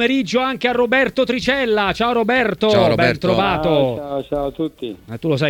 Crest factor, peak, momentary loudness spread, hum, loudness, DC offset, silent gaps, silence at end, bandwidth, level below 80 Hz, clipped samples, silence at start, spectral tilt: 16 dB; 0 dBFS; 10 LU; none; -17 LUFS; under 0.1%; none; 0 s; 17.5 kHz; -44 dBFS; under 0.1%; 0 s; -6 dB/octave